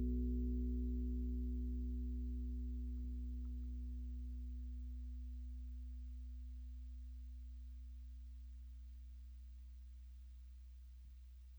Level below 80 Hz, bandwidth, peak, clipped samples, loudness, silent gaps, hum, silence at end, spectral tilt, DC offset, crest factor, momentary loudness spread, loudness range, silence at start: -46 dBFS; over 20 kHz; -32 dBFS; under 0.1%; -48 LUFS; none; none; 0 s; -10 dB/octave; under 0.1%; 12 dB; 16 LU; 12 LU; 0 s